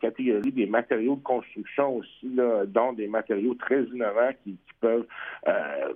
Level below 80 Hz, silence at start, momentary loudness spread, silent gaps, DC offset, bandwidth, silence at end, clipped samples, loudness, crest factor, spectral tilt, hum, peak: -70 dBFS; 0 s; 6 LU; none; under 0.1%; 3.7 kHz; 0 s; under 0.1%; -27 LUFS; 18 dB; -8.5 dB/octave; none; -8 dBFS